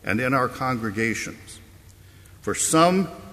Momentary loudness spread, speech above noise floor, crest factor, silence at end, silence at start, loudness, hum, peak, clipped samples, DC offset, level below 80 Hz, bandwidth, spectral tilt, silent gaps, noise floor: 17 LU; 25 dB; 20 dB; 0 s; 0.05 s; -22 LUFS; none; -4 dBFS; under 0.1%; under 0.1%; -52 dBFS; 15.5 kHz; -4 dB/octave; none; -48 dBFS